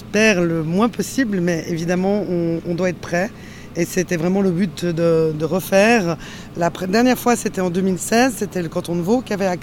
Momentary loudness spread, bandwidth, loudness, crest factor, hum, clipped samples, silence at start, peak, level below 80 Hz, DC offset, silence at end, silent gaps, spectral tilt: 8 LU; 17 kHz; -19 LUFS; 16 dB; none; under 0.1%; 0 s; -2 dBFS; -46 dBFS; under 0.1%; 0 s; none; -5.5 dB/octave